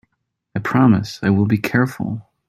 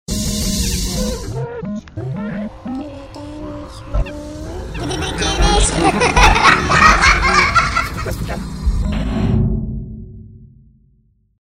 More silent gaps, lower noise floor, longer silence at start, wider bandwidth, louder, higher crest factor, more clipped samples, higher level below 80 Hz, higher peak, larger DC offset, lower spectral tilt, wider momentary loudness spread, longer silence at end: neither; first, -74 dBFS vs -56 dBFS; first, 0.55 s vs 0.1 s; about the same, 15 kHz vs 16 kHz; about the same, -18 LUFS vs -16 LUFS; about the same, 16 dB vs 18 dB; neither; second, -52 dBFS vs -24 dBFS; about the same, -2 dBFS vs 0 dBFS; neither; first, -7.5 dB/octave vs -4 dB/octave; second, 12 LU vs 20 LU; second, 0.3 s vs 0.95 s